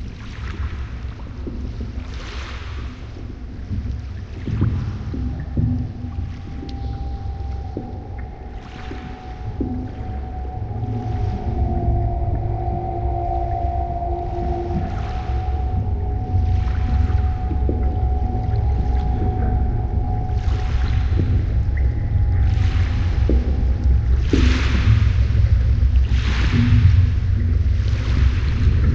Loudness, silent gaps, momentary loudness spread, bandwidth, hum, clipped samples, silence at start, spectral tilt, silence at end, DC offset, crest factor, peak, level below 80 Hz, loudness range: -22 LUFS; none; 14 LU; 6.8 kHz; none; under 0.1%; 0 s; -8 dB/octave; 0 s; under 0.1%; 18 dB; -2 dBFS; -22 dBFS; 12 LU